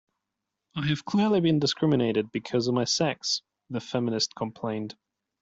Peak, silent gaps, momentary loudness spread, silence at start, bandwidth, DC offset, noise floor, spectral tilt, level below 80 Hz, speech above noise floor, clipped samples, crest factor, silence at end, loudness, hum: -12 dBFS; none; 11 LU; 0.75 s; 8 kHz; under 0.1%; -85 dBFS; -5 dB/octave; -64 dBFS; 59 dB; under 0.1%; 16 dB; 0.5 s; -27 LUFS; none